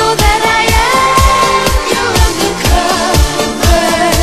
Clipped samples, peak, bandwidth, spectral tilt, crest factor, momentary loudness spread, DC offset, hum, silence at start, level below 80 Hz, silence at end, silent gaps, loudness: 0.3%; 0 dBFS; 14.5 kHz; -3.5 dB/octave; 10 dB; 4 LU; 2%; none; 0 s; -16 dBFS; 0 s; none; -10 LUFS